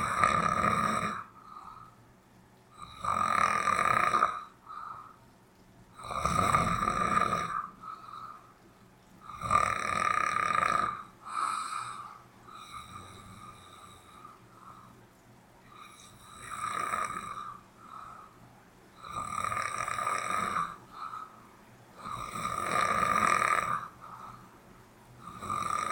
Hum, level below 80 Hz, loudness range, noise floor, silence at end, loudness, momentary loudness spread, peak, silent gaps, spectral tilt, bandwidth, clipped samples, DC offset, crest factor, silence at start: none; -56 dBFS; 12 LU; -59 dBFS; 0 s; -30 LUFS; 24 LU; -8 dBFS; none; -3.5 dB/octave; 19 kHz; under 0.1%; under 0.1%; 24 dB; 0 s